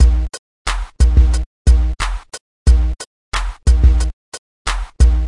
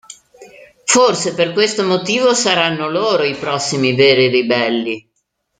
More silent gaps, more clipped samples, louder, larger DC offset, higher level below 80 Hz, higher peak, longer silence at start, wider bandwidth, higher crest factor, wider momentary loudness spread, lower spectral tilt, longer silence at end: first, 0.39-0.65 s, 1.46-1.65 s, 2.40-2.66 s, 3.07-3.32 s, 4.13-4.32 s, 4.38-4.65 s vs none; neither; second, -17 LUFS vs -14 LUFS; neither; first, -14 dBFS vs -60 dBFS; about the same, 0 dBFS vs 0 dBFS; about the same, 0 s vs 0.1 s; first, 11.5 kHz vs 9.6 kHz; about the same, 14 dB vs 16 dB; first, 14 LU vs 7 LU; first, -5 dB/octave vs -3 dB/octave; second, 0 s vs 0.6 s